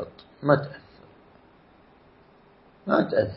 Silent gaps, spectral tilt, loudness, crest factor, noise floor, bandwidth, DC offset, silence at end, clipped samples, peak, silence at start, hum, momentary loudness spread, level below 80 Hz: none; -11 dB/octave; -24 LUFS; 24 dB; -56 dBFS; 5.8 kHz; under 0.1%; 0 s; under 0.1%; -4 dBFS; 0 s; none; 18 LU; -62 dBFS